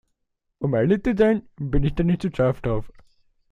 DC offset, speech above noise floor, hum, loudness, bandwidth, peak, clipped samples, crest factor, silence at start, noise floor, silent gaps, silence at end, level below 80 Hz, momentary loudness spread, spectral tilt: under 0.1%; 55 dB; none; -23 LUFS; 9.8 kHz; -6 dBFS; under 0.1%; 16 dB; 0.6 s; -76 dBFS; none; 0.6 s; -36 dBFS; 8 LU; -9 dB/octave